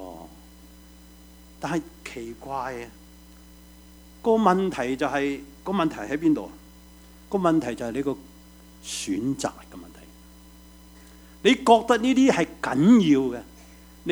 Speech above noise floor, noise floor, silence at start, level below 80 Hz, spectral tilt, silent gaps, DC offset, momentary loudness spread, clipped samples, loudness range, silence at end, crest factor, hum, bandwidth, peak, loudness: 26 dB; -49 dBFS; 0 s; -52 dBFS; -5.5 dB/octave; none; under 0.1%; 20 LU; under 0.1%; 15 LU; 0 s; 24 dB; none; over 20 kHz; -2 dBFS; -23 LUFS